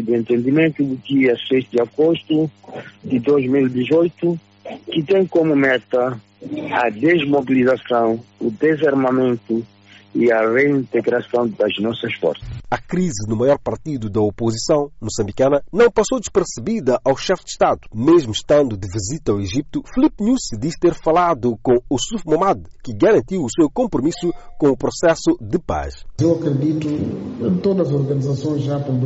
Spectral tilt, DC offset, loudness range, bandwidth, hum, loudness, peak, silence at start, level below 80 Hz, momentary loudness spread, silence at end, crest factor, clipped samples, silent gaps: -5.5 dB/octave; under 0.1%; 2 LU; 8 kHz; none; -18 LUFS; -4 dBFS; 0 s; -42 dBFS; 9 LU; 0 s; 14 dB; under 0.1%; none